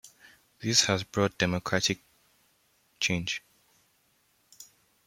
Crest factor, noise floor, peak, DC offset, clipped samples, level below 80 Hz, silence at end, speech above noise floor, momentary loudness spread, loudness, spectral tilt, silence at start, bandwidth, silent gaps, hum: 24 dB; -69 dBFS; -8 dBFS; under 0.1%; under 0.1%; -64 dBFS; 0.45 s; 41 dB; 12 LU; -28 LUFS; -3 dB/octave; 0.05 s; 16.5 kHz; none; none